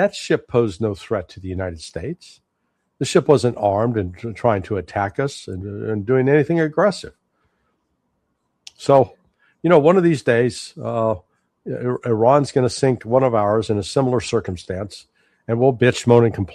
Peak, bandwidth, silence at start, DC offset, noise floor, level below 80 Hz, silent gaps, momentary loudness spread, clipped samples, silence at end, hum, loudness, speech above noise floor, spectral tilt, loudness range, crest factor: 0 dBFS; 11.5 kHz; 0 s; under 0.1%; -72 dBFS; -52 dBFS; none; 14 LU; under 0.1%; 0 s; none; -19 LUFS; 53 dB; -6.5 dB/octave; 3 LU; 18 dB